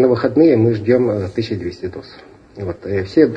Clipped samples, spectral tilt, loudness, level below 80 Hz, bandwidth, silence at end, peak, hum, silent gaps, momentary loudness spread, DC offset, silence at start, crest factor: under 0.1%; -9 dB/octave; -16 LUFS; -50 dBFS; 7.8 kHz; 0 s; 0 dBFS; none; none; 16 LU; under 0.1%; 0 s; 16 dB